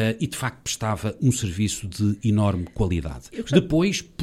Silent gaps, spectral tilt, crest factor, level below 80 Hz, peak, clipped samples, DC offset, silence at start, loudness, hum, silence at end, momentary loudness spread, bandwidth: none; -5.5 dB/octave; 20 dB; -40 dBFS; -4 dBFS; under 0.1%; under 0.1%; 0 s; -24 LUFS; none; 0 s; 6 LU; 15 kHz